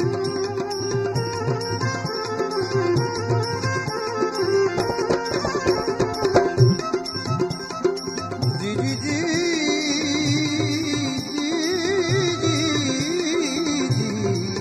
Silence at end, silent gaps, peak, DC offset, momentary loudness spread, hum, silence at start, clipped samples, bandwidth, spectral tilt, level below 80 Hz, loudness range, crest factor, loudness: 0 s; none; -4 dBFS; under 0.1%; 5 LU; none; 0 s; under 0.1%; 14.5 kHz; -5 dB/octave; -50 dBFS; 2 LU; 18 dB; -22 LUFS